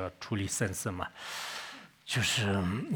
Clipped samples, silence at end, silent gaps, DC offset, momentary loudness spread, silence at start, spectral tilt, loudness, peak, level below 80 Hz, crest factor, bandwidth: under 0.1%; 0 s; none; under 0.1%; 12 LU; 0 s; -4 dB/octave; -33 LUFS; -16 dBFS; -64 dBFS; 18 dB; over 20 kHz